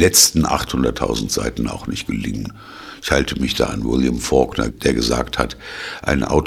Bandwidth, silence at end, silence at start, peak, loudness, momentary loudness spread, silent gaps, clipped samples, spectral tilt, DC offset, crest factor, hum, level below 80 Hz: 19 kHz; 0 s; 0 s; 0 dBFS; -19 LUFS; 12 LU; none; under 0.1%; -3.5 dB/octave; under 0.1%; 18 dB; none; -32 dBFS